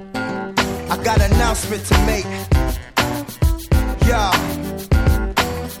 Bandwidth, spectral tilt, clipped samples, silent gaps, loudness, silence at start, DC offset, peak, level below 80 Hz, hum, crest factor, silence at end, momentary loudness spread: 17 kHz; -5 dB/octave; under 0.1%; none; -19 LUFS; 0 s; under 0.1%; -2 dBFS; -22 dBFS; none; 16 dB; 0 s; 7 LU